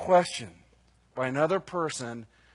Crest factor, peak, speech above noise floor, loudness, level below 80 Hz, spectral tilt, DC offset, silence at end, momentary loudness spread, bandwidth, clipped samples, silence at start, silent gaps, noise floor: 20 dB; -10 dBFS; 35 dB; -29 LUFS; -66 dBFS; -4.5 dB/octave; under 0.1%; 0.3 s; 19 LU; 11 kHz; under 0.1%; 0 s; none; -63 dBFS